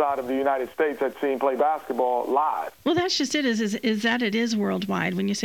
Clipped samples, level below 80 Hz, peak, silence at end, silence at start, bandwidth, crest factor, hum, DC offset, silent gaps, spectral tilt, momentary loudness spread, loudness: under 0.1%; -68 dBFS; -8 dBFS; 0 s; 0 s; 19 kHz; 16 dB; none; under 0.1%; none; -4.5 dB/octave; 3 LU; -24 LUFS